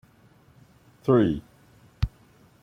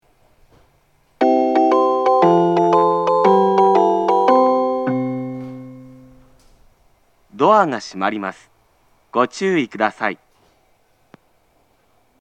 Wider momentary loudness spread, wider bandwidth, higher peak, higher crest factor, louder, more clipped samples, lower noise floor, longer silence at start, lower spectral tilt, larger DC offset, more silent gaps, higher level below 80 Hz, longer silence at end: about the same, 12 LU vs 13 LU; about the same, 9.6 kHz vs 9 kHz; second, -10 dBFS vs 0 dBFS; about the same, 20 dB vs 18 dB; second, -26 LUFS vs -16 LUFS; neither; about the same, -57 dBFS vs -60 dBFS; second, 1.05 s vs 1.2 s; first, -9 dB/octave vs -6.5 dB/octave; neither; neither; first, -42 dBFS vs -62 dBFS; second, 0.55 s vs 2.05 s